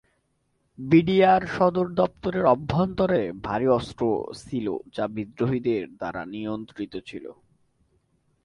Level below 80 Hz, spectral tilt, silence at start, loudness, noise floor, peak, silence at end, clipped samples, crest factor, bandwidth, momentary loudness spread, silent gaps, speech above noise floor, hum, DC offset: -54 dBFS; -8 dB/octave; 0.8 s; -24 LUFS; -71 dBFS; -6 dBFS; 1.15 s; under 0.1%; 18 dB; 11 kHz; 15 LU; none; 47 dB; none; under 0.1%